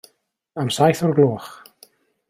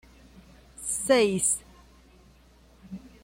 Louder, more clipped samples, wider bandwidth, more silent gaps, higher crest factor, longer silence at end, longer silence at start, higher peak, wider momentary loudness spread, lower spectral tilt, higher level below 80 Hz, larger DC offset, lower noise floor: first, -19 LUFS vs -25 LUFS; neither; about the same, 16 kHz vs 16.5 kHz; neither; about the same, 18 dB vs 20 dB; first, 0.75 s vs 0.15 s; second, 0.55 s vs 0.8 s; first, -4 dBFS vs -10 dBFS; second, 18 LU vs 23 LU; first, -6 dB/octave vs -3 dB/octave; about the same, -60 dBFS vs -56 dBFS; neither; first, -65 dBFS vs -57 dBFS